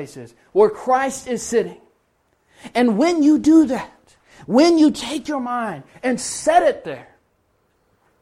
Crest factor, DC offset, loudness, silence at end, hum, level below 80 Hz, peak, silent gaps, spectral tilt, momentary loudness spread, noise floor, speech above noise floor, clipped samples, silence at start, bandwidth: 18 dB; under 0.1%; -18 LUFS; 1.2 s; none; -56 dBFS; -2 dBFS; none; -4.5 dB/octave; 15 LU; -64 dBFS; 47 dB; under 0.1%; 0 s; 12.5 kHz